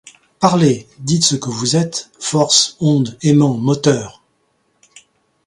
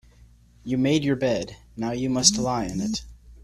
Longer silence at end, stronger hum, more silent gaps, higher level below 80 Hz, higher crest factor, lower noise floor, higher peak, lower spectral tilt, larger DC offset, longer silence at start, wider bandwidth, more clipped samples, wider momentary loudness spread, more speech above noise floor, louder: first, 1.35 s vs 0.05 s; neither; neither; second, -54 dBFS vs -48 dBFS; second, 16 dB vs 24 dB; first, -63 dBFS vs -53 dBFS; about the same, 0 dBFS vs -2 dBFS; about the same, -4.5 dB/octave vs -3.5 dB/octave; neither; second, 0.4 s vs 0.65 s; second, 11.5 kHz vs 14 kHz; neither; second, 9 LU vs 14 LU; first, 48 dB vs 29 dB; first, -15 LUFS vs -24 LUFS